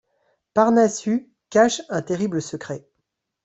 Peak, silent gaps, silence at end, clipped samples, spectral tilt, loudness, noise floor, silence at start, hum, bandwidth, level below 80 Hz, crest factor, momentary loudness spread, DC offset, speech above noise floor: -4 dBFS; none; 0.65 s; under 0.1%; -5 dB/octave; -21 LUFS; -77 dBFS; 0.55 s; none; 8.2 kHz; -64 dBFS; 20 dB; 14 LU; under 0.1%; 57 dB